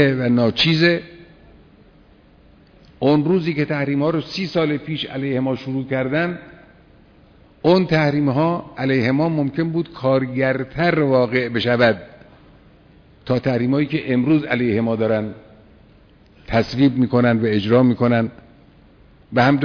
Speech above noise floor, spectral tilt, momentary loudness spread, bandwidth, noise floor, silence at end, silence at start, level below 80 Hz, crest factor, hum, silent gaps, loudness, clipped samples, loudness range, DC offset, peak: 32 dB; -8 dB/octave; 7 LU; 5.4 kHz; -50 dBFS; 0 s; 0 s; -50 dBFS; 20 dB; none; none; -19 LUFS; under 0.1%; 3 LU; under 0.1%; 0 dBFS